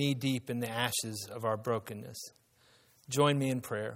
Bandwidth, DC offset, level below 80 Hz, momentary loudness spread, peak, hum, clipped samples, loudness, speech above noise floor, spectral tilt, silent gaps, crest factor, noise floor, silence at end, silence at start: 16 kHz; under 0.1%; -72 dBFS; 15 LU; -12 dBFS; none; under 0.1%; -33 LUFS; 33 dB; -4.5 dB/octave; none; 22 dB; -66 dBFS; 0 s; 0 s